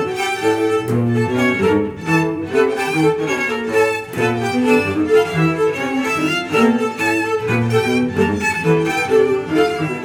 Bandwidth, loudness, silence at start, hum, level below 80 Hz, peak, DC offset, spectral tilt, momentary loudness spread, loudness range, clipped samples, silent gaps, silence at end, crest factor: 18 kHz; -17 LUFS; 0 s; none; -50 dBFS; -2 dBFS; under 0.1%; -6 dB/octave; 3 LU; 1 LU; under 0.1%; none; 0 s; 16 dB